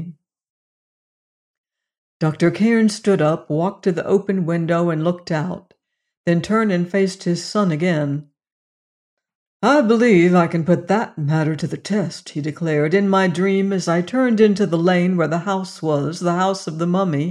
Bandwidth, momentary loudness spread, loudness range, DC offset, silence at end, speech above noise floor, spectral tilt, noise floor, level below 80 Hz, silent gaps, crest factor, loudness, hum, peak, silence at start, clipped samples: 11 kHz; 8 LU; 3 LU; under 0.1%; 0 s; over 72 dB; -7 dB/octave; under -90 dBFS; -62 dBFS; 0.49-1.64 s, 1.98-2.20 s, 6.17-6.24 s, 8.52-9.17 s, 9.35-9.60 s; 16 dB; -18 LUFS; none; -4 dBFS; 0 s; under 0.1%